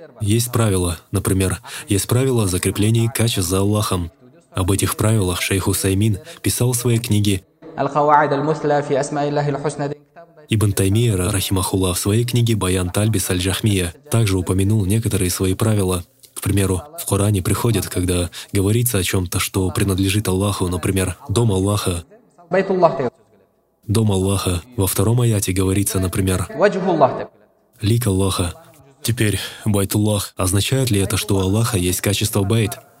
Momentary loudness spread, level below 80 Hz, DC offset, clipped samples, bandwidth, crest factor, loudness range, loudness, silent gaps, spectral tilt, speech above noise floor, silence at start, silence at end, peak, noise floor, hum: 6 LU; -42 dBFS; under 0.1%; under 0.1%; 16.5 kHz; 18 dB; 2 LU; -19 LUFS; none; -5 dB/octave; 40 dB; 0 s; 0.2 s; 0 dBFS; -58 dBFS; none